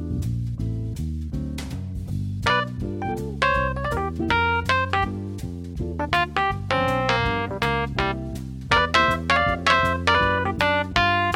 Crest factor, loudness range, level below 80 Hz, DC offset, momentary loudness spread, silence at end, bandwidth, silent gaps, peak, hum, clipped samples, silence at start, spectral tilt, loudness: 22 dB; 5 LU; -36 dBFS; under 0.1%; 12 LU; 0 s; 16 kHz; none; 0 dBFS; none; under 0.1%; 0 s; -5.5 dB/octave; -23 LUFS